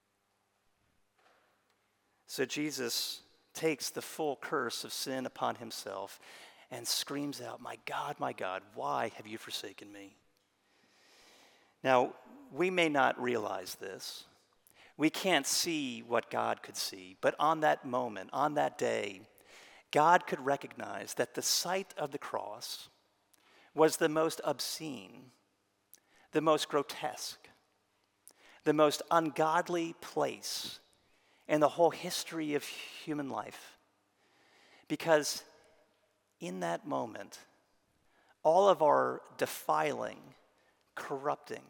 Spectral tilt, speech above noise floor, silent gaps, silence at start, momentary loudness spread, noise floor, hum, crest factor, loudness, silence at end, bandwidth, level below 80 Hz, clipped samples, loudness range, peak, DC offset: -3 dB/octave; 44 dB; none; 2.3 s; 16 LU; -78 dBFS; none; 26 dB; -33 LUFS; 0.1 s; 18 kHz; -86 dBFS; under 0.1%; 7 LU; -10 dBFS; under 0.1%